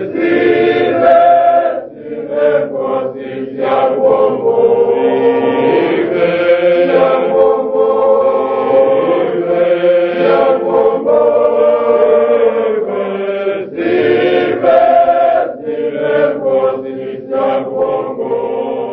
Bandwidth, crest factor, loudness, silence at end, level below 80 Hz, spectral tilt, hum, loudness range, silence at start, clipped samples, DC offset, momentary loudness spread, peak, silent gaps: 5 kHz; 12 dB; -12 LUFS; 0 s; -54 dBFS; -8.5 dB/octave; none; 2 LU; 0 s; under 0.1%; under 0.1%; 9 LU; 0 dBFS; none